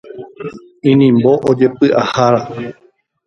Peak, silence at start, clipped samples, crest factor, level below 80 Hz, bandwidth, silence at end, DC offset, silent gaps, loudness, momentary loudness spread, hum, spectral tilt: 0 dBFS; 0.05 s; under 0.1%; 14 dB; -54 dBFS; 7.4 kHz; 0.55 s; under 0.1%; none; -12 LUFS; 19 LU; none; -7.5 dB/octave